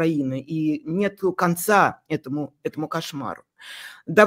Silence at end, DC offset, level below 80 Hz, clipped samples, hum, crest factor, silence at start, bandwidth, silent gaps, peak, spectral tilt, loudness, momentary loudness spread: 0 s; under 0.1%; -66 dBFS; under 0.1%; none; 22 dB; 0 s; 16 kHz; none; -2 dBFS; -5.5 dB/octave; -24 LUFS; 18 LU